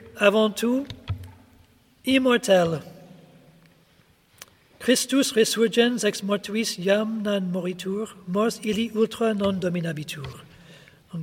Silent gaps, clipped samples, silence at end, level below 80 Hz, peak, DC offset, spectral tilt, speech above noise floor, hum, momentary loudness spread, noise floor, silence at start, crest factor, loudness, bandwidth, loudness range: none; under 0.1%; 0 s; -58 dBFS; -4 dBFS; under 0.1%; -4.5 dB/octave; 37 dB; none; 13 LU; -59 dBFS; 0 s; 22 dB; -23 LUFS; 17 kHz; 3 LU